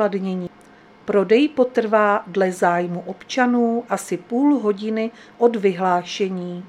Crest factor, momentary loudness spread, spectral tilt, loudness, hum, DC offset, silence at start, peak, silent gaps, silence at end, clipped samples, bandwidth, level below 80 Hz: 18 dB; 10 LU; -6 dB/octave; -20 LUFS; none; under 0.1%; 0 s; -2 dBFS; none; 0 s; under 0.1%; 13.5 kHz; -68 dBFS